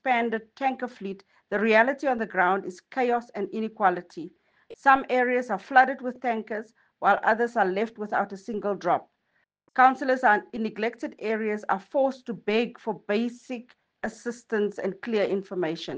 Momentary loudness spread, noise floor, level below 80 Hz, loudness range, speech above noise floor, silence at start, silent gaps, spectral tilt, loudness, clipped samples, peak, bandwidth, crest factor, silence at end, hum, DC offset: 14 LU; -73 dBFS; -70 dBFS; 5 LU; 47 dB; 0.05 s; none; -5.5 dB/octave; -26 LUFS; under 0.1%; -4 dBFS; 9 kHz; 22 dB; 0 s; none; under 0.1%